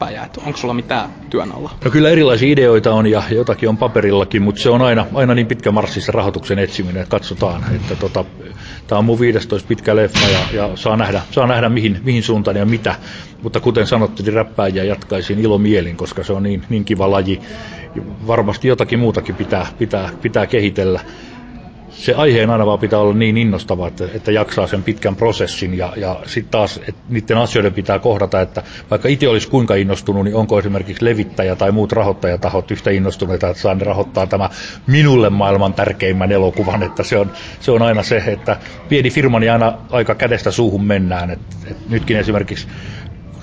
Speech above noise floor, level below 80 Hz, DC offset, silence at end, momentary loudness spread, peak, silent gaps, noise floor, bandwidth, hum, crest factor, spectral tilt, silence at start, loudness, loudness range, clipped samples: 19 dB; -36 dBFS; under 0.1%; 0 s; 10 LU; -2 dBFS; none; -34 dBFS; 8 kHz; none; 14 dB; -6.5 dB/octave; 0 s; -15 LUFS; 4 LU; under 0.1%